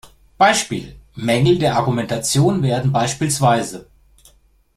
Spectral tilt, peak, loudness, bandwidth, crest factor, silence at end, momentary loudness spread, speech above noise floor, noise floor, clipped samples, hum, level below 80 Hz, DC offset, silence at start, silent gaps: -5 dB/octave; -2 dBFS; -17 LUFS; 15 kHz; 18 dB; 0.95 s; 12 LU; 37 dB; -54 dBFS; under 0.1%; none; -46 dBFS; under 0.1%; 0.05 s; none